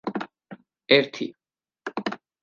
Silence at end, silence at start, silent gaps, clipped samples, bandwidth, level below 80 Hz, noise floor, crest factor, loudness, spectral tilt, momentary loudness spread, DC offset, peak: 0.25 s; 0.05 s; none; under 0.1%; 7.2 kHz; -76 dBFS; -48 dBFS; 26 dB; -25 LUFS; -5 dB/octave; 20 LU; under 0.1%; -2 dBFS